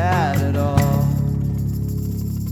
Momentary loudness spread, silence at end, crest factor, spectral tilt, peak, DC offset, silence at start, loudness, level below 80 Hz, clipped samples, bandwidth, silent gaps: 7 LU; 0 s; 18 dB; -7.5 dB/octave; -2 dBFS; under 0.1%; 0 s; -20 LUFS; -32 dBFS; under 0.1%; 19.5 kHz; none